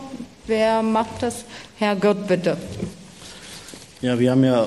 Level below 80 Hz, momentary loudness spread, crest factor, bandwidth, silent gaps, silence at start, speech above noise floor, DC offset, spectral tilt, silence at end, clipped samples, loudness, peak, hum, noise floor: -52 dBFS; 19 LU; 16 dB; 13 kHz; none; 0 s; 21 dB; 0.1%; -6 dB/octave; 0 s; under 0.1%; -21 LUFS; -6 dBFS; none; -41 dBFS